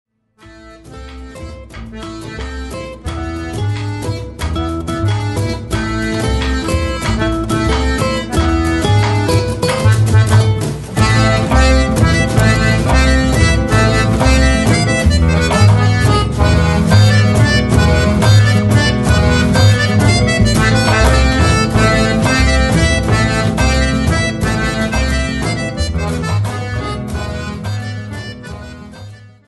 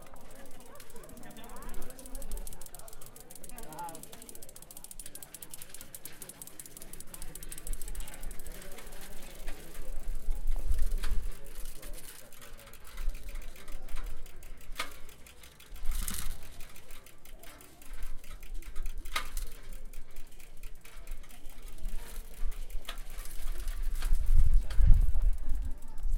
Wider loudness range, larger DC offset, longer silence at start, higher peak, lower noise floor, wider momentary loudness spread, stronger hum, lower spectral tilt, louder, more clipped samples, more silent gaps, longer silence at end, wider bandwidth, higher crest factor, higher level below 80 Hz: about the same, 10 LU vs 12 LU; neither; first, 0.45 s vs 0 s; first, 0 dBFS vs -6 dBFS; second, -43 dBFS vs -50 dBFS; about the same, 15 LU vs 15 LU; neither; first, -5.5 dB/octave vs -3.5 dB/octave; first, -13 LUFS vs -41 LUFS; neither; neither; first, 0.2 s vs 0 s; second, 12 kHz vs 16.5 kHz; second, 12 dB vs 22 dB; first, -20 dBFS vs -32 dBFS